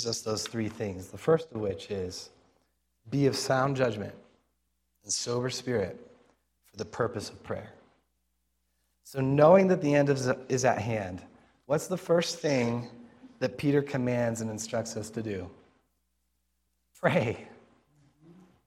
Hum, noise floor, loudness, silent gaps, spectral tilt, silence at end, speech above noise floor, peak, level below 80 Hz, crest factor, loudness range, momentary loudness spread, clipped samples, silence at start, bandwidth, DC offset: none; -78 dBFS; -29 LUFS; none; -5 dB/octave; 1.15 s; 49 dB; -6 dBFS; -66 dBFS; 24 dB; 9 LU; 15 LU; under 0.1%; 0 s; 15.5 kHz; under 0.1%